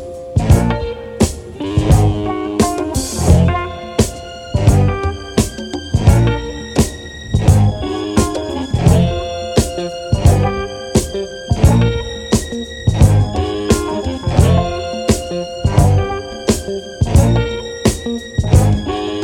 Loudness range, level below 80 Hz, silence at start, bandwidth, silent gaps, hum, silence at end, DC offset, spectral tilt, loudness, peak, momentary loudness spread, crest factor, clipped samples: 1 LU; -22 dBFS; 0 s; 17 kHz; none; none; 0 s; under 0.1%; -6 dB/octave; -16 LUFS; 0 dBFS; 9 LU; 14 dB; under 0.1%